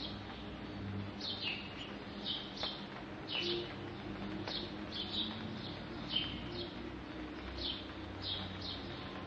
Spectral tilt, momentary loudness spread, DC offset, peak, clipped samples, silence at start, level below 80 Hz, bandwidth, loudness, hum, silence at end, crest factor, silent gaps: -5.5 dB/octave; 9 LU; under 0.1%; -22 dBFS; under 0.1%; 0 s; -58 dBFS; 9 kHz; -41 LUFS; none; 0 s; 20 dB; none